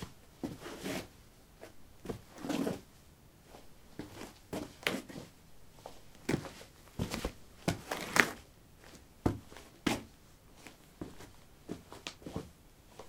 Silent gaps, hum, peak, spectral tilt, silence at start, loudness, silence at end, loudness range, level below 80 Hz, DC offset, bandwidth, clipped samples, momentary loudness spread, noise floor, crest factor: none; none; -4 dBFS; -4 dB/octave; 0 s; -39 LUFS; 0 s; 8 LU; -58 dBFS; under 0.1%; 17 kHz; under 0.1%; 21 LU; -59 dBFS; 38 dB